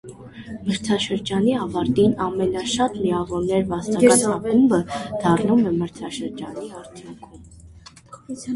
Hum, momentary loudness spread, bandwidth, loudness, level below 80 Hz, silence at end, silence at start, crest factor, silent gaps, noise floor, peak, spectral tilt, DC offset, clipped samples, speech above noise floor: none; 19 LU; 11.5 kHz; -21 LUFS; -50 dBFS; 0 s; 0.05 s; 20 dB; none; -45 dBFS; -2 dBFS; -5 dB/octave; under 0.1%; under 0.1%; 25 dB